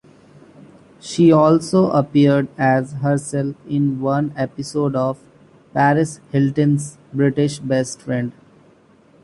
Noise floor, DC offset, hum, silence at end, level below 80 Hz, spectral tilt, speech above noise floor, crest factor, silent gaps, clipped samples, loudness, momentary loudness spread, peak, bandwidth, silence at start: -51 dBFS; under 0.1%; none; 0.9 s; -56 dBFS; -7 dB/octave; 34 dB; 16 dB; none; under 0.1%; -18 LUFS; 10 LU; -2 dBFS; 11.5 kHz; 1.05 s